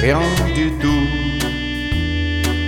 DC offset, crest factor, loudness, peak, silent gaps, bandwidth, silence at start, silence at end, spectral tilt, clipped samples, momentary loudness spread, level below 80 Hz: under 0.1%; 14 dB; -19 LUFS; -2 dBFS; none; 17.5 kHz; 0 s; 0 s; -5.5 dB/octave; under 0.1%; 4 LU; -24 dBFS